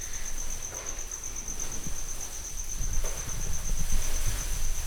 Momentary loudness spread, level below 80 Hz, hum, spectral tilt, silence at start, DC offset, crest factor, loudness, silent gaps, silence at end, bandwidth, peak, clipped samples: 4 LU; -30 dBFS; none; -2 dB/octave; 0 s; under 0.1%; 16 dB; -34 LUFS; none; 0 s; 19.5 kHz; -12 dBFS; under 0.1%